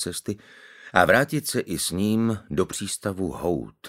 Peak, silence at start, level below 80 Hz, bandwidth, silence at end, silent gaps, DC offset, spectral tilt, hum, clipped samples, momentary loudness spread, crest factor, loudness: 0 dBFS; 0 s; -52 dBFS; 16 kHz; 0 s; none; under 0.1%; -4.5 dB/octave; none; under 0.1%; 10 LU; 24 dB; -24 LUFS